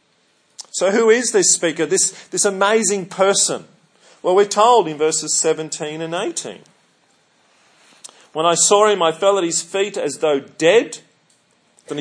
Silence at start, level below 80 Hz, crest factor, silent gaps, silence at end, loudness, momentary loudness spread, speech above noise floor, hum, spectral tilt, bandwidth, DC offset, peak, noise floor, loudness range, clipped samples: 0.6 s; -78 dBFS; 18 dB; none; 0 s; -16 LUFS; 13 LU; 44 dB; none; -2 dB/octave; 10.5 kHz; under 0.1%; 0 dBFS; -60 dBFS; 6 LU; under 0.1%